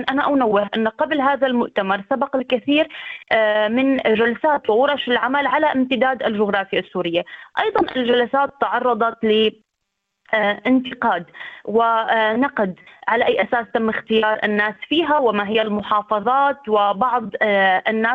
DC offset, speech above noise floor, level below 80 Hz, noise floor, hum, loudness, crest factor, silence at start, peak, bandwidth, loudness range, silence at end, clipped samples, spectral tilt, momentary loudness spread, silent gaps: under 0.1%; 58 dB; -60 dBFS; -76 dBFS; none; -19 LUFS; 16 dB; 0 s; -4 dBFS; 5.4 kHz; 2 LU; 0 s; under 0.1%; -7 dB/octave; 5 LU; none